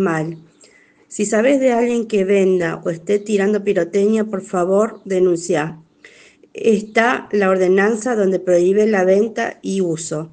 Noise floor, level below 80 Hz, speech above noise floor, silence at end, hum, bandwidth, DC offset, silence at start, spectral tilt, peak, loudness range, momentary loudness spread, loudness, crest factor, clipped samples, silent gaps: -50 dBFS; -62 dBFS; 34 dB; 0.05 s; none; 9.6 kHz; under 0.1%; 0 s; -5.5 dB/octave; 0 dBFS; 3 LU; 9 LU; -17 LUFS; 16 dB; under 0.1%; none